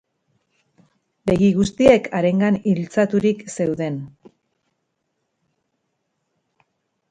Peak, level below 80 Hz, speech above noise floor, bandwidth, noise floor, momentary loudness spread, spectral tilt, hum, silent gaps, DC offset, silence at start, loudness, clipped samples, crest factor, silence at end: 0 dBFS; -50 dBFS; 56 dB; 9.2 kHz; -74 dBFS; 12 LU; -7 dB/octave; none; none; under 0.1%; 1.25 s; -19 LUFS; under 0.1%; 22 dB; 3.05 s